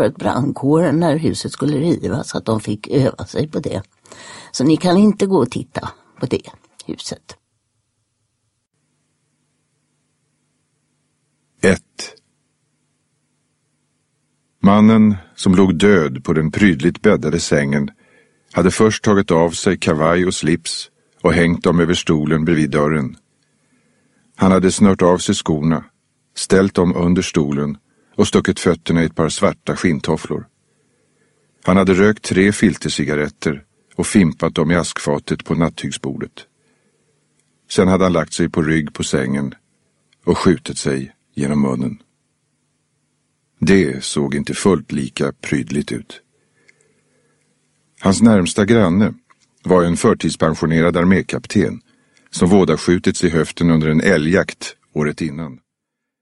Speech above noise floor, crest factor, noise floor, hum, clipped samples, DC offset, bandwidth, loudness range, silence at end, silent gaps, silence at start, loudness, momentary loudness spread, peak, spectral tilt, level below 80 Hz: 63 dB; 18 dB; -79 dBFS; none; under 0.1%; under 0.1%; 11.5 kHz; 9 LU; 0.65 s; none; 0 s; -16 LUFS; 13 LU; 0 dBFS; -6 dB/octave; -44 dBFS